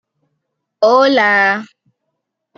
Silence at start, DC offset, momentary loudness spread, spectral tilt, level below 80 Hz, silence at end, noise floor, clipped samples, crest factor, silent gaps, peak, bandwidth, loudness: 0.8 s; under 0.1%; 6 LU; -4 dB/octave; -72 dBFS; 0.95 s; -74 dBFS; under 0.1%; 16 dB; none; -2 dBFS; 7 kHz; -12 LUFS